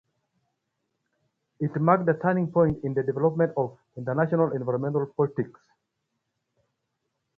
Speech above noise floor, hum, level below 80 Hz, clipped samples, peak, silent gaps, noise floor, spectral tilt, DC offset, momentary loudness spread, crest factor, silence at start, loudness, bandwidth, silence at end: 55 dB; none; -60 dBFS; under 0.1%; -6 dBFS; none; -80 dBFS; -11.5 dB/octave; under 0.1%; 10 LU; 22 dB; 1.6 s; -25 LUFS; 3.9 kHz; 1.9 s